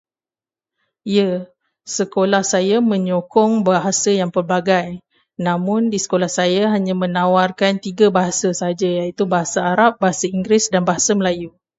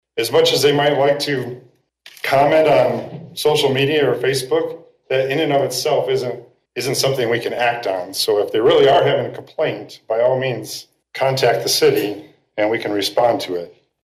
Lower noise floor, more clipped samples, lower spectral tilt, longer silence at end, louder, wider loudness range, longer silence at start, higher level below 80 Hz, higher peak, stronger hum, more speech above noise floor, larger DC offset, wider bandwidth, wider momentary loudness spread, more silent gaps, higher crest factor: first, under -90 dBFS vs -47 dBFS; neither; about the same, -4.5 dB/octave vs -4 dB/octave; about the same, 0.3 s vs 0.35 s; about the same, -17 LUFS vs -17 LUFS; about the same, 1 LU vs 2 LU; first, 1.05 s vs 0.15 s; about the same, -58 dBFS vs -60 dBFS; first, 0 dBFS vs -6 dBFS; neither; first, over 73 dB vs 30 dB; neither; second, 8 kHz vs 16 kHz; second, 6 LU vs 14 LU; neither; first, 18 dB vs 12 dB